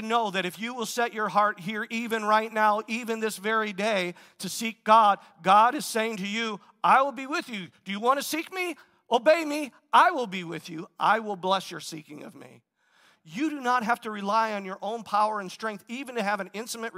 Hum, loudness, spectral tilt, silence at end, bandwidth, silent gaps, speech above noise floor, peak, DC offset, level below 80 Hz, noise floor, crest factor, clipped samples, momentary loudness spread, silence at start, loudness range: none; -26 LUFS; -3.5 dB/octave; 0 s; 16 kHz; none; 37 dB; -6 dBFS; under 0.1%; -86 dBFS; -63 dBFS; 20 dB; under 0.1%; 15 LU; 0 s; 7 LU